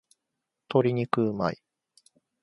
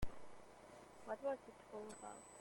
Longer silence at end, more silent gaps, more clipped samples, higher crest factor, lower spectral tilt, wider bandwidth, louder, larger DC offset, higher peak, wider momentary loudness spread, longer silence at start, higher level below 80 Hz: first, 0.9 s vs 0 s; neither; neither; about the same, 22 dB vs 20 dB; first, -8.5 dB/octave vs -5 dB/octave; second, 11.5 kHz vs 16.5 kHz; first, -27 LUFS vs -51 LUFS; neither; first, -6 dBFS vs -28 dBFS; second, 7 LU vs 16 LU; first, 0.7 s vs 0 s; about the same, -64 dBFS vs -60 dBFS